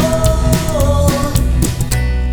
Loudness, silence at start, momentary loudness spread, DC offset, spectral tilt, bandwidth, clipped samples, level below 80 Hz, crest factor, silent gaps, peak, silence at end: -15 LUFS; 0 s; 3 LU; under 0.1%; -5.5 dB/octave; over 20 kHz; under 0.1%; -16 dBFS; 12 dB; none; 0 dBFS; 0 s